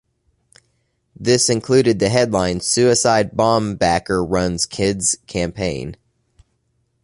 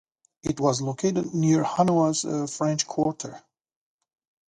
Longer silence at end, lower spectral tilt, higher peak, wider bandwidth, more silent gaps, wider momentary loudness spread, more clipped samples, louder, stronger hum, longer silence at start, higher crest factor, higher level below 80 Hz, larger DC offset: about the same, 1.1 s vs 1.1 s; second, -4 dB/octave vs -5.5 dB/octave; first, 0 dBFS vs -8 dBFS; about the same, 11.5 kHz vs 11.5 kHz; neither; about the same, 9 LU vs 10 LU; neither; first, -17 LUFS vs -25 LUFS; neither; first, 1.2 s vs 0.45 s; about the same, 18 dB vs 18 dB; first, -42 dBFS vs -60 dBFS; neither